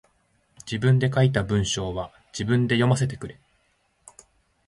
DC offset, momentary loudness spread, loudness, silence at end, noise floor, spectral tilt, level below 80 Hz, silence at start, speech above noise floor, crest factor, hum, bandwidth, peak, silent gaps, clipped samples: under 0.1%; 15 LU; -23 LUFS; 1.35 s; -67 dBFS; -6 dB/octave; -48 dBFS; 0.65 s; 45 dB; 20 dB; none; 11.5 kHz; -6 dBFS; none; under 0.1%